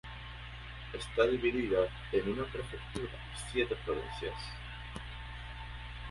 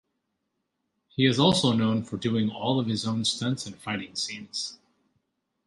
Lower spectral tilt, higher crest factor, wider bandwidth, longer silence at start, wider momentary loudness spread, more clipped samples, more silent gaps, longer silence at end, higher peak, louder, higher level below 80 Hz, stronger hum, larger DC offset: about the same, -5.5 dB/octave vs -5 dB/octave; about the same, 22 dB vs 22 dB; about the same, 11.5 kHz vs 11.5 kHz; second, 0.05 s vs 1.2 s; about the same, 14 LU vs 12 LU; neither; neither; second, 0 s vs 0.9 s; second, -16 dBFS vs -6 dBFS; second, -37 LUFS vs -26 LUFS; first, -48 dBFS vs -62 dBFS; first, 60 Hz at -45 dBFS vs none; neither